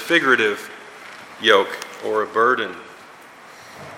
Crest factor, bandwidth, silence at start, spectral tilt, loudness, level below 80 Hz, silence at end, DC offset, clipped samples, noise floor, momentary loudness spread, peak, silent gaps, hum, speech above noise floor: 22 dB; 16.5 kHz; 0 s; -3 dB/octave; -19 LUFS; -72 dBFS; 0 s; under 0.1%; under 0.1%; -43 dBFS; 22 LU; 0 dBFS; none; none; 24 dB